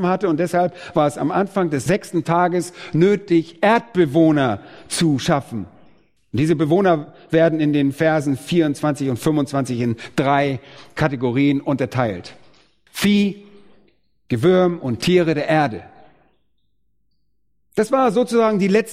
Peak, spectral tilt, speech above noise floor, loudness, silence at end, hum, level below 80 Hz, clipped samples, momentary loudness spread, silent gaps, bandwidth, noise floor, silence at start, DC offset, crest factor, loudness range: -2 dBFS; -6.5 dB/octave; 54 dB; -19 LUFS; 0 s; none; -54 dBFS; under 0.1%; 8 LU; none; 15.5 kHz; -72 dBFS; 0 s; under 0.1%; 18 dB; 3 LU